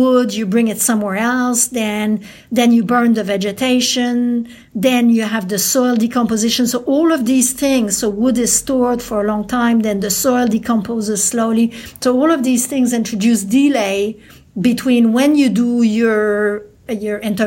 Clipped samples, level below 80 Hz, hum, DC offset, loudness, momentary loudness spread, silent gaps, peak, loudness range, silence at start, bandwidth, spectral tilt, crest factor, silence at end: under 0.1%; -50 dBFS; none; under 0.1%; -15 LUFS; 6 LU; none; -2 dBFS; 1 LU; 0 s; 17 kHz; -3.5 dB/octave; 14 dB; 0 s